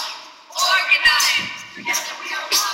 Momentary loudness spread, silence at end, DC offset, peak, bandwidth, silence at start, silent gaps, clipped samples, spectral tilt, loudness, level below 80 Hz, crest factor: 16 LU; 0 s; under 0.1%; -2 dBFS; 16 kHz; 0 s; none; under 0.1%; 1.5 dB/octave; -17 LUFS; -56 dBFS; 18 dB